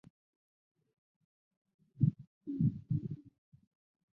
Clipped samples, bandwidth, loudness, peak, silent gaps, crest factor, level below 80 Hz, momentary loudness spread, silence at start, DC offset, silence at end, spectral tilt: under 0.1%; 0.9 kHz; -36 LUFS; -18 dBFS; 2.27-2.41 s; 22 dB; -64 dBFS; 14 LU; 2 s; under 0.1%; 0.9 s; -14.5 dB/octave